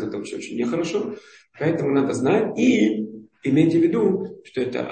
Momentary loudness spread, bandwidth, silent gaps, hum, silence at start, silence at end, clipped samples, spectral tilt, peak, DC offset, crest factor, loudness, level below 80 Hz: 13 LU; 8.8 kHz; none; none; 0 s; 0 s; under 0.1%; -6.5 dB/octave; -6 dBFS; under 0.1%; 16 dB; -22 LUFS; -62 dBFS